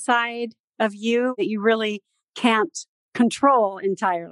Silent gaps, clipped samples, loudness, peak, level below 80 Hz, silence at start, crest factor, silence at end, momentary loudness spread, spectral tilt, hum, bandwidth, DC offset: 0.60-0.68 s, 2.24-2.33 s, 2.88-3.12 s; under 0.1%; -22 LUFS; -4 dBFS; -78 dBFS; 0 s; 18 dB; 0 s; 16 LU; -4 dB/octave; none; 11.5 kHz; under 0.1%